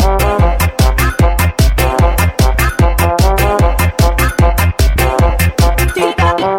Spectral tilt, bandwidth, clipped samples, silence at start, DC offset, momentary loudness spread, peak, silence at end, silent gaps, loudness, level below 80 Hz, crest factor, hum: -5.5 dB/octave; 17 kHz; under 0.1%; 0 s; 0.3%; 1 LU; 0 dBFS; 0 s; none; -12 LUFS; -14 dBFS; 10 dB; none